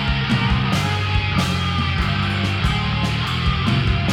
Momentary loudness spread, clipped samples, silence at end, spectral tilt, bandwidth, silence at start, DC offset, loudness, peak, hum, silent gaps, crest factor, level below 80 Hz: 2 LU; under 0.1%; 0 s; -5.5 dB/octave; 15 kHz; 0 s; 0.1%; -20 LUFS; -6 dBFS; none; none; 12 dB; -28 dBFS